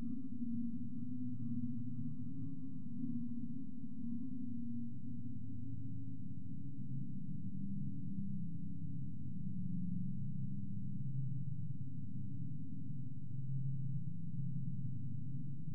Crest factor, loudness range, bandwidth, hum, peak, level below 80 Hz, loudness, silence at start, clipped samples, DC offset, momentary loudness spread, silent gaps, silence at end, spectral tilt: 14 dB; 3 LU; 1.3 kHz; none; -28 dBFS; -74 dBFS; -45 LUFS; 0 s; under 0.1%; 1%; 5 LU; none; 0 s; -20.5 dB/octave